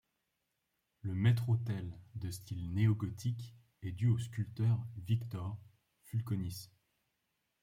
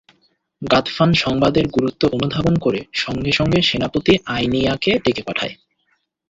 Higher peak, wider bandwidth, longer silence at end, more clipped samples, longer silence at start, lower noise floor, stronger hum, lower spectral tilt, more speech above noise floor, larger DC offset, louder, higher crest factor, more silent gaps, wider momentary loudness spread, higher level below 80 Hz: second, -20 dBFS vs -2 dBFS; first, 15 kHz vs 7.8 kHz; first, 0.95 s vs 0.75 s; neither; first, 1.05 s vs 0.6 s; first, -84 dBFS vs -67 dBFS; neither; about the same, -7 dB/octave vs -6 dB/octave; about the same, 49 dB vs 49 dB; neither; second, -37 LUFS vs -18 LUFS; about the same, 18 dB vs 18 dB; neither; first, 14 LU vs 7 LU; second, -66 dBFS vs -42 dBFS